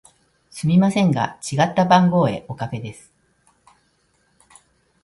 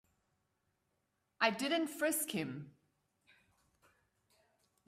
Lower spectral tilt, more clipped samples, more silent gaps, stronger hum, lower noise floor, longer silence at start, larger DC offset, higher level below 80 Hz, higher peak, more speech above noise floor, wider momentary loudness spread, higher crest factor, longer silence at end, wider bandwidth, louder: first, -6.5 dB/octave vs -3 dB/octave; neither; neither; neither; second, -64 dBFS vs -83 dBFS; second, 0.55 s vs 1.4 s; neither; first, -58 dBFS vs -84 dBFS; first, 0 dBFS vs -14 dBFS; about the same, 45 dB vs 47 dB; first, 15 LU vs 10 LU; second, 20 dB vs 26 dB; about the same, 2.1 s vs 2.2 s; second, 11.5 kHz vs 15.5 kHz; first, -19 LUFS vs -36 LUFS